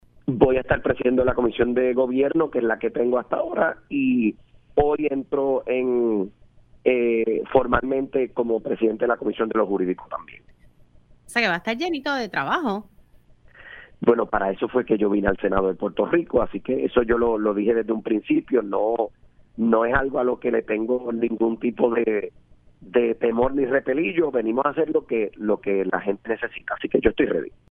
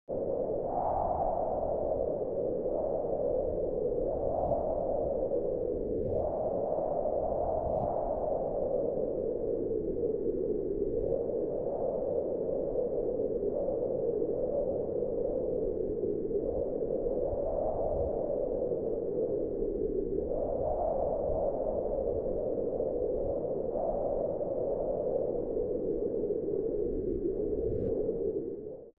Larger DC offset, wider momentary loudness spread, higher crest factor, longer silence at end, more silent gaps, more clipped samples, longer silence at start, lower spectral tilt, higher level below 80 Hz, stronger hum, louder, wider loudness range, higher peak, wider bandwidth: second, under 0.1% vs 0.2%; first, 6 LU vs 2 LU; first, 20 dB vs 14 dB; first, 0.2 s vs 0.05 s; neither; neither; first, 0.25 s vs 0.1 s; second, -7 dB/octave vs -13 dB/octave; about the same, -44 dBFS vs -46 dBFS; neither; first, -23 LUFS vs -33 LUFS; about the same, 3 LU vs 1 LU; first, -2 dBFS vs -18 dBFS; first, 11 kHz vs 2.2 kHz